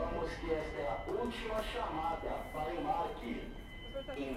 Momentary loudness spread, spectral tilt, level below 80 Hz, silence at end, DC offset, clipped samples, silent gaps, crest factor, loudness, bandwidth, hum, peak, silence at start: 8 LU; -5.5 dB/octave; -48 dBFS; 0 s; under 0.1%; under 0.1%; none; 16 dB; -39 LUFS; 16 kHz; none; -22 dBFS; 0 s